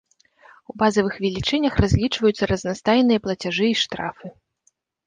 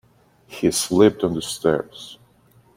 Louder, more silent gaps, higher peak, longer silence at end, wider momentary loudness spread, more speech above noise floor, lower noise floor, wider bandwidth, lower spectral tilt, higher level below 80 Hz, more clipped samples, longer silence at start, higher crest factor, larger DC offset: about the same, -21 LUFS vs -20 LUFS; neither; about the same, -4 dBFS vs -2 dBFS; first, 0.75 s vs 0.6 s; second, 12 LU vs 22 LU; first, 46 dB vs 35 dB; first, -67 dBFS vs -55 dBFS; second, 9.8 kHz vs 16.5 kHz; about the same, -5.5 dB/octave vs -4.5 dB/octave; first, -38 dBFS vs -54 dBFS; neither; first, 0.75 s vs 0.5 s; about the same, 18 dB vs 20 dB; neither